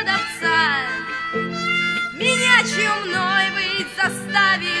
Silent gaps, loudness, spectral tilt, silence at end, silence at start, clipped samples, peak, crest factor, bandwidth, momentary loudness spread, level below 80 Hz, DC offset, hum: none; -18 LUFS; -2.5 dB/octave; 0 s; 0 s; under 0.1%; 0 dBFS; 20 dB; 11 kHz; 9 LU; -58 dBFS; under 0.1%; none